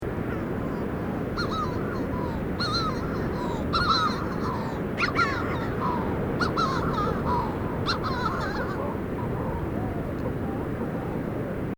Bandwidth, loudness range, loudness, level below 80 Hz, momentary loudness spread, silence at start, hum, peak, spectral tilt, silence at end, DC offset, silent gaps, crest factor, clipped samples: over 20 kHz; 3 LU; -28 LUFS; -40 dBFS; 6 LU; 0 s; none; -12 dBFS; -6.5 dB/octave; 0.05 s; under 0.1%; none; 16 dB; under 0.1%